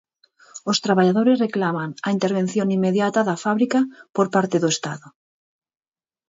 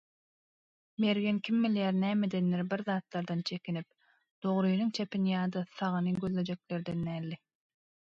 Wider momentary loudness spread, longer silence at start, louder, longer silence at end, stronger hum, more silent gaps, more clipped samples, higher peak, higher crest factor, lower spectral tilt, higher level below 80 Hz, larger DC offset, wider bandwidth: about the same, 8 LU vs 9 LU; second, 0.55 s vs 1 s; first, -20 LUFS vs -33 LUFS; first, 1.2 s vs 0.8 s; neither; second, none vs 4.31-4.42 s; neither; first, -6 dBFS vs -16 dBFS; about the same, 16 dB vs 16 dB; second, -5.5 dB/octave vs -7.5 dB/octave; about the same, -68 dBFS vs -70 dBFS; neither; about the same, 8 kHz vs 7.4 kHz